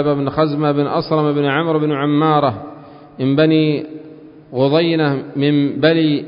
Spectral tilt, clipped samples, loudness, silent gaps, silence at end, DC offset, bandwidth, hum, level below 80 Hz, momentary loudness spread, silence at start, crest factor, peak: -12 dB/octave; under 0.1%; -16 LUFS; none; 0 s; under 0.1%; 5.4 kHz; none; -54 dBFS; 9 LU; 0 s; 14 dB; -2 dBFS